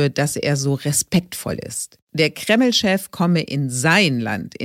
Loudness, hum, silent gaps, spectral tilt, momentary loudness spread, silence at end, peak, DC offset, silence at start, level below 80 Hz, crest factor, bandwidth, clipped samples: -19 LUFS; none; 2.02-2.07 s; -4 dB/octave; 12 LU; 0 s; -2 dBFS; under 0.1%; 0 s; -54 dBFS; 18 dB; 16.5 kHz; under 0.1%